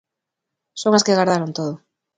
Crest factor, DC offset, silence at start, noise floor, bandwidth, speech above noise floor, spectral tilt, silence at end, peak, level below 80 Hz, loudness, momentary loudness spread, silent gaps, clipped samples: 20 dB; under 0.1%; 0.75 s; -82 dBFS; 9.6 kHz; 65 dB; -4.5 dB/octave; 0.4 s; 0 dBFS; -66 dBFS; -19 LUFS; 19 LU; none; under 0.1%